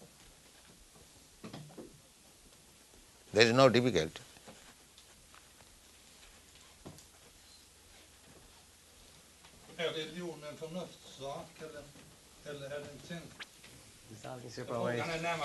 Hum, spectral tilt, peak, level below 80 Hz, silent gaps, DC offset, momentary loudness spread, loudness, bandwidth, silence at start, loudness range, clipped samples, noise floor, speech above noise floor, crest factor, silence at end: none; -4.5 dB/octave; -6 dBFS; -68 dBFS; none; under 0.1%; 24 LU; -34 LUFS; 12 kHz; 0 s; 24 LU; under 0.1%; -61 dBFS; 28 dB; 32 dB; 0 s